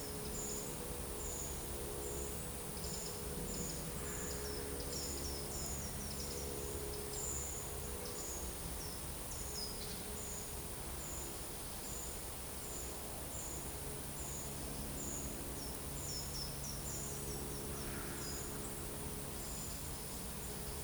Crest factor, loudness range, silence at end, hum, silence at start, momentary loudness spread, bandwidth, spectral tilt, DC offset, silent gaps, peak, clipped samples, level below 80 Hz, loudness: 18 dB; 2 LU; 0 s; none; 0 s; 2 LU; over 20 kHz; -3 dB/octave; under 0.1%; none; -26 dBFS; under 0.1%; -52 dBFS; -42 LUFS